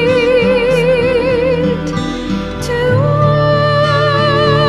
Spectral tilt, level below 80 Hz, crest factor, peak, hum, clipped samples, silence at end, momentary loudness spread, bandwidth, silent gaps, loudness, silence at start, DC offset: -6.5 dB/octave; -32 dBFS; 12 dB; 0 dBFS; none; under 0.1%; 0 s; 7 LU; 12.5 kHz; none; -13 LUFS; 0 s; 0.1%